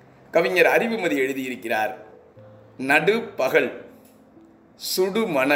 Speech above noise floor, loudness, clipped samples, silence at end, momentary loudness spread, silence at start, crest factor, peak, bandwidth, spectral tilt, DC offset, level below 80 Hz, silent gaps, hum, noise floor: 30 dB; -22 LUFS; under 0.1%; 0 s; 12 LU; 0.35 s; 20 dB; -4 dBFS; 16 kHz; -4 dB/octave; under 0.1%; -70 dBFS; none; none; -51 dBFS